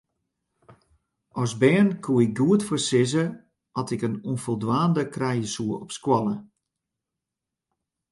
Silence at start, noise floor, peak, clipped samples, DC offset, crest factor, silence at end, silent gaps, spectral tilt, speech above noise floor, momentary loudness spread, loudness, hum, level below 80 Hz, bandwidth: 0.7 s; -87 dBFS; -6 dBFS; under 0.1%; under 0.1%; 20 dB; 1.65 s; none; -6 dB/octave; 63 dB; 10 LU; -24 LUFS; none; -64 dBFS; 11.5 kHz